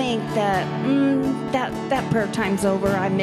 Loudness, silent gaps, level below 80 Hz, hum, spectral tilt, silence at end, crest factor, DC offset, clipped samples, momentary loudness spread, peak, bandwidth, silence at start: -22 LUFS; none; -48 dBFS; none; -6 dB/octave; 0 s; 12 dB; under 0.1%; under 0.1%; 4 LU; -8 dBFS; 14.5 kHz; 0 s